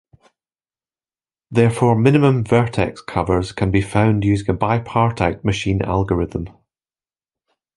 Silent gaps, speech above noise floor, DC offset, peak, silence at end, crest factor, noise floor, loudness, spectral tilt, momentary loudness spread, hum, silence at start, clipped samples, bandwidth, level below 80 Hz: none; over 73 dB; under 0.1%; -2 dBFS; 1.3 s; 18 dB; under -90 dBFS; -18 LUFS; -7.5 dB/octave; 8 LU; none; 1.5 s; under 0.1%; 11.5 kHz; -38 dBFS